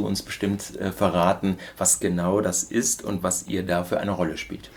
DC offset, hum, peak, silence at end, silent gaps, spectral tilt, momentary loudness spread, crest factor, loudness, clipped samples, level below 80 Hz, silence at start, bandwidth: under 0.1%; none; -4 dBFS; 0 s; none; -4 dB/octave; 7 LU; 20 dB; -24 LUFS; under 0.1%; -52 dBFS; 0 s; over 20 kHz